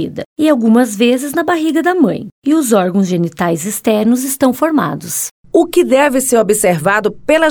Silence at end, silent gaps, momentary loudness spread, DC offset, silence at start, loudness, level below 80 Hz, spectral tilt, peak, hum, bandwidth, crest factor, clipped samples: 0 s; 0.26-0.36 s, 2.32-2.42 s, 5.31-5.44 s; 5 LU; under 0.1%; 0 s; -13 LUFS; -50 dBFS; -4.5 dB/octave; 0 dBFS; none; over 20 kHz; 12 dB; under 0.1%